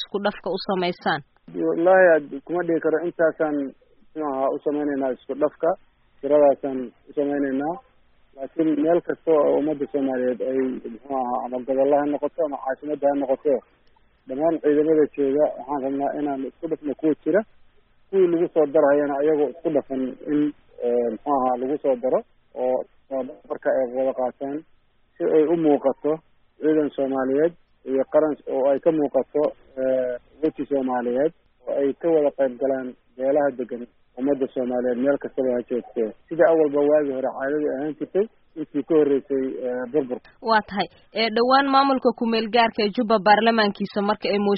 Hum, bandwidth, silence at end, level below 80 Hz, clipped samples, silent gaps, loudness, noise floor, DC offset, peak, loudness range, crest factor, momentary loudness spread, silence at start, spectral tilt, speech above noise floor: none; 5 kHz; 0 s; -62 dBFS; under 0.1%; none; -23 LUFS; -58 dBFS; under 0.1%; -4 dBFS; 3 LU; 18 dB; 11 LU; 0 s; -3.5 dB/octave; 36 dB